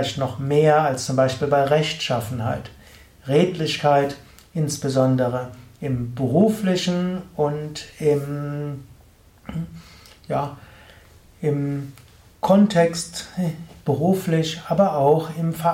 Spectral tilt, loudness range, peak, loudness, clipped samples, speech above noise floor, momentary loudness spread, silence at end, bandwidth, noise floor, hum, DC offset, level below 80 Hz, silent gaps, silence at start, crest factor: -6 dB/octave; 9 LU; -4 dBFS; -22 LUFS; under 0.1%; 31 dB; 15 LU; 0 s; 16.5 kHz; -51 dBFS; none; under 0.1%; -52 dBFS; none; 0 s; 18 dB